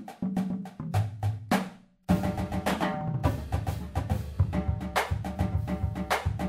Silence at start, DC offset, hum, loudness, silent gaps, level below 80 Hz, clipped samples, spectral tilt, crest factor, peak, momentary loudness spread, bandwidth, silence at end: 0 s; under 0.1%; none; -30 LUFS; none; -40 dBFS; under 0.1%; -6.5 dB/octave; 18 dB; -12 dBFS; 5 LU; 16 kHz; 0 s